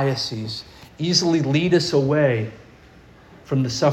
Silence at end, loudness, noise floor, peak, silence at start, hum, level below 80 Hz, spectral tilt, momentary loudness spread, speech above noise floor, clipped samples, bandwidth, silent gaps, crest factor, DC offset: 0 s; -20 LUFS; -48 dBFS; -6 dBFS; 0 s; none; -54 dBFS; -5 dB/octave; 12 LU; 28 dB; under 0.1%; 13 kHz; none; 16 dB; under 0.1%